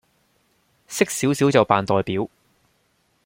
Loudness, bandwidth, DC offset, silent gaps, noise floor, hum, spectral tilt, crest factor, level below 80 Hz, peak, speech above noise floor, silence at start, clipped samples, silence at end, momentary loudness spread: -21 LUFS; 16.5 kHz; under 0.1%; none; -66 dBFS; none; -5 dB/octave; 22 dB; -60 dBFS; -2 dBFS; 46 dB; 0.9 s; under 0.1%; 1 s; 12 LU